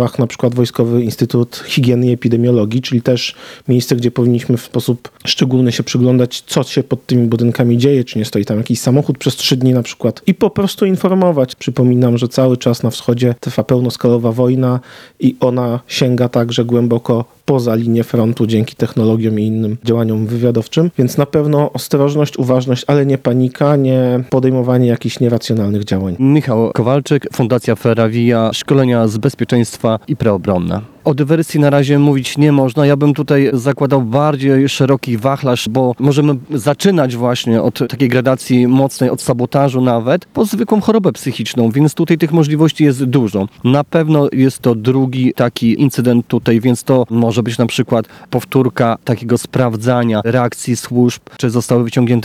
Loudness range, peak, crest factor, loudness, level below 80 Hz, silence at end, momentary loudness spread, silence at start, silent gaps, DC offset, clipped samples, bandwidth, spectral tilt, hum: 2 LU; 0 dBFS; 12 dB; -14 LUFS; -52 dBFS; 0 s; 5 LU; 0 s; none; under 0.1%; 0.2%; 15.5 kHz; -6.5 dB/octave; none